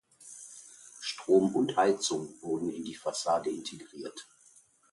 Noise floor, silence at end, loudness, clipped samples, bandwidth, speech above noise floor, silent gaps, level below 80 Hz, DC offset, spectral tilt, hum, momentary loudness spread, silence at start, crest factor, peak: -62 dBFS; 0.7 s; -30 LUFS; under 0.1%; 11.5 kHz; 32 dB; none; -74 dBFS; under 0.1%; -4 dB/octave; none; 21 LU; 0.25 s; 20 dB; -12 dBFS